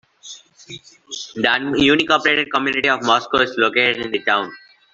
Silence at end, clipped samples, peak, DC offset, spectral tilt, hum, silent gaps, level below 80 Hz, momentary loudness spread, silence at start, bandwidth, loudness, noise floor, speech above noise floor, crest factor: 0.35 s; under 0.1%; -2 dBFS; under 0.1%; -3.5 dB/octave; none; none; -54 dBFS; 22 LU; 0.25 s; 7.8 kHz; -17 LUFS; -41 dBFS; 23 dB; 18 dB